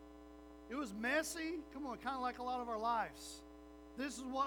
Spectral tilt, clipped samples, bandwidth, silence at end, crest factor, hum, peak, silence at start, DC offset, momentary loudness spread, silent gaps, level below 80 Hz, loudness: -3 dB/octave; under 0.1%; over 20 kHz; 0 s; 18 dB; 60 Hz at -65 dBFS; -24 dBFS; 0 s; under 0.1%; 20 LU; none; -64 dBFS; -42 LUFS